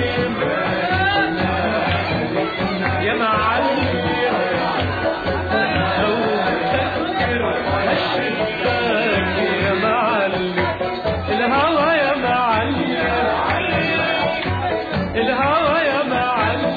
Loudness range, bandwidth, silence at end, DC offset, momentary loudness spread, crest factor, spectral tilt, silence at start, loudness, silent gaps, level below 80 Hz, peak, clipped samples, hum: 1 LU; 4.9 kHz; 0 s; under 0.1%; 4 LU; 14 dB; -8 dB/octave; 0 s; -19 LUFS; none; -42 dBFS; -6 dBFS; under 0.1%; none